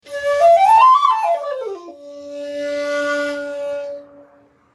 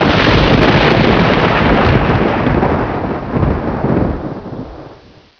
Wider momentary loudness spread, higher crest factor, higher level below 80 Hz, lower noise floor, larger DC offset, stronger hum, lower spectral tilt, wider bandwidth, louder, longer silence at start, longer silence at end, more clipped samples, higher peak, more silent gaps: first, 23 LU vs 14 LU; about the same, 16 dB vs 12 dB; second, -66 dBFS vs -24 dBFS; first, -52 dBFS vs -40 dBFS; neither; neither; second, -2.5 dB/octave vs -7.5 dB/octave; first, 12.5 kHz vs 5.4 kHz; second, -16 LUFS vs -12 LUFS; about the same, 0.05 s vs 0 s; first, 0.7 s vs 0.45 s; neither; about the same, -2 dBFS vs 0 dBFS; neither